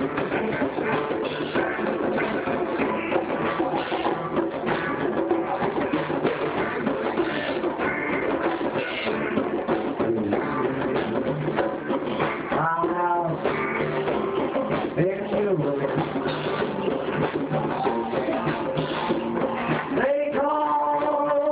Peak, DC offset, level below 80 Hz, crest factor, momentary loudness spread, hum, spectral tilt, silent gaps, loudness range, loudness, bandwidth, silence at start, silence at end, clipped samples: -8 dBFS; under 0.1%; -54 dBFS; 16 dB; 3 LU; none; -10 dB/octave; none; 1 LU; -25 LUFS; 4 kHz; 0 s; 0 s; under 0.1%